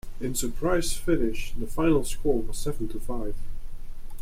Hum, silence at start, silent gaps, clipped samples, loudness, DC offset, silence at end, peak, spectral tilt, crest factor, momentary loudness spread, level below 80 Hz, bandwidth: none; 0.05 s; none; under 0.1%; -29 LUFS; under 0.1%; 0 s; -10 dBFS; -5 dB/octave; 14 dB; 20 LU; -32 dBFS; 15.5 kHz